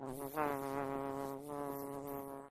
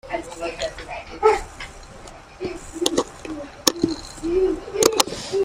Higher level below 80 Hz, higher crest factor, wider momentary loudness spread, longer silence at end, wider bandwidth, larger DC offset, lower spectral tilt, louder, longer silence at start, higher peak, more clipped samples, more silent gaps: second, -66 dBFS vs -44 dBFS; about the same, 20 dB vs 24 dB; second, 6 LU vs 17 LU; about the same, 0 s vs 0 s; second, 14.5 kHz vs 16 kHz; neither; first, -6 dB/octave vs -2.5 dB/octave; second, -42 LUFS vs -23 LUFS; about the same, 0 s vs 0.05 s; second, -22 dBFS vs 0 dBFS; neither; neither